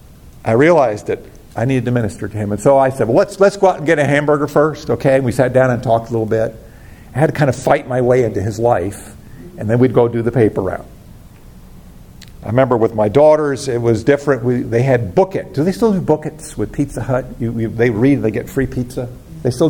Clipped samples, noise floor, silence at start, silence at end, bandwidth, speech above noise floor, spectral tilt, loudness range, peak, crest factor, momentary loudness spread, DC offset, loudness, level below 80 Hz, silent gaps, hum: under 0.1%; -38 dBFS; 0.25 s; 0 s; 17 kHz; 24 dB; -7 dB/octave; 4 LU; 0 dBFS; 14 dB; 11 LU; under 0.1%; -15 LUFS; -40 dBFS; none; none